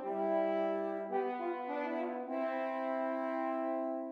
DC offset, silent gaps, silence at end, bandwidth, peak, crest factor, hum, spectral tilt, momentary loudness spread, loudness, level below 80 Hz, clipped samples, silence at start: under 0.1%; none; 0 s; 6 kHz; -22 dBFS; 14 dB; none; -7.5 dB/octave; 5 LU; -36 LUFS; under -90 dBFS; under 0.1%; 0 s